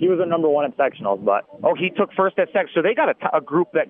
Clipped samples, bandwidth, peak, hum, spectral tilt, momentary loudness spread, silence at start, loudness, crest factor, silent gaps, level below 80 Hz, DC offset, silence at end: under 0.1%; 3.8 kHz; -4 dBFS; none; -9.5 dB/octave; 3 LU; 0 s; -20 LUFS; 14 dB; none; -78 dBFS; under 0.1%; 0.05 s